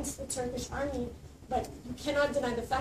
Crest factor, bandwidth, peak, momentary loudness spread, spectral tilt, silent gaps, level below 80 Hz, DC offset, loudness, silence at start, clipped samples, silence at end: 18 dB; 15 kHz; -16 dBFS; 11 LU; -4 dB/octave; none; -48 dBFS; under 0.1%; -34 LUFS; 0 s; under 0.1%; 0 s